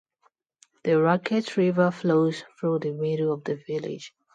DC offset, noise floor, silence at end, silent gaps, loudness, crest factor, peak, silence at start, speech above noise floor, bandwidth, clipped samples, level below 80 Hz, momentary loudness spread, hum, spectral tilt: under 0.1%; -68 dBFS; 0.25 s; none; -25 LUFS; 18 dB; -8 dBFS; 0.85 s; 44 dB; 9.2 kHz; under 0.1%; -72 dBFS; 10 LU; none; -7.5 dB/octave